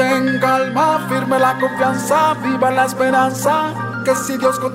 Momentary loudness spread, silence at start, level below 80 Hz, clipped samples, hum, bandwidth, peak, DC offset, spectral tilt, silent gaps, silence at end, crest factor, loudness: 3 LU; 0 s; -56 dBFS; under 0.1%; none; 16 kHz; -4 dBFS; under 0.1%; -4.5 dB/octave; none; 0 s; 12 dB; -16 LUFS